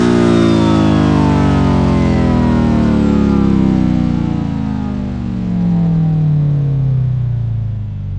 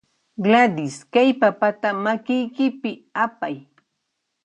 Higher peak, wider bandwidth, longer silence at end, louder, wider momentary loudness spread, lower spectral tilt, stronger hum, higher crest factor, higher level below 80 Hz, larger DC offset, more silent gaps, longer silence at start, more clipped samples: about the same, 0 dBFS vs -2 dBFS; about the same, 9.4 kHz vs 10 kHz; second, 0 s vs 0.85 s; first, -13 LUFS vs -21 LUFS; second, 8 LU vs 14 LU; first, -8.5 dB/octave vs -5.5 dB/octave; neither; second, 12 dB vs 18 dB; first, -26 dBFS vs -72 dBFS; neither; neither; second, 0 s vs 0.4 s; neither